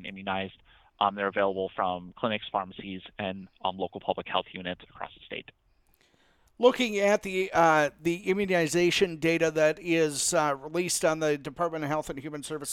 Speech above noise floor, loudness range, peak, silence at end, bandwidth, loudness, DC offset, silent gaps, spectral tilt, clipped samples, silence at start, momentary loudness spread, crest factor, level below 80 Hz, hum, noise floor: 38 dB; 10 LU; -8 dBFS; 0 s; 16.5 kHz; -28 LUFS; under 0.1%; none; -4 dB/octave; under 0.1%; 0 s; 14 LU; 20 dB; -62 dBFS; none; -66 dBFS